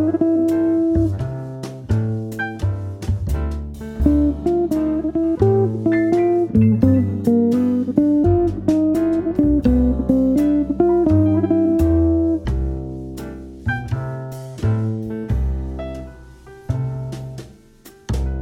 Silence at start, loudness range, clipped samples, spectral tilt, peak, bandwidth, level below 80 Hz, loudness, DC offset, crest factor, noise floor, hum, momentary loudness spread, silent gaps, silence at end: 0 s; 9 LU; under 0.1%; -9 dB/octave; 0 dBFS; 15 kHz; -30 dBFS; -19 LUFS; under 0.1%; 18 dB; -46 dBFS; none; 14 LU; none; 0 s